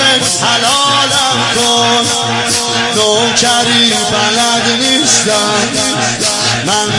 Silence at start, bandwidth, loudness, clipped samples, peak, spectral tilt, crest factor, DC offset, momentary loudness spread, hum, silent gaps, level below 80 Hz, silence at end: 0 s; 11.5 kHz; -9 LUFS; under 0.1%; 0 dBFS; -1.5 dB/octave; 12 dB; under 0.1%; 4 LU; none; none; -48 dBFS; 0 s